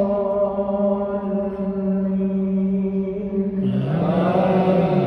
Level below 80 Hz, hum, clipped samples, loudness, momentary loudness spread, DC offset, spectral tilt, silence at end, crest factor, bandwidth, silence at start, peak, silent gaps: -48 dBFS; none; under 0.1%; -21 LUFS; 6 LU; under 0.1%; -10.5 dB/octave; 0 s; 14 dB; 4.7 kHz; 0 s; -6 dBFS; none